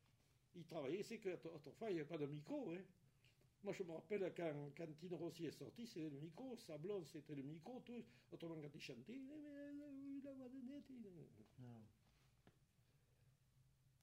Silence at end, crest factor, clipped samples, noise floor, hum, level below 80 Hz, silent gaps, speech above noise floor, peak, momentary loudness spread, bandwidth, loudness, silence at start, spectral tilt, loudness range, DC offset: 0.35 s; 20 dB; under 0.1%; -78 dBFS; none; -86 dBFS; none; 27 dB; -34 dBFS; 13 LU; 16 kHz; -53 LUFS; 0.55 s; -6.5 dB/octave; 9 LU; under 0.1%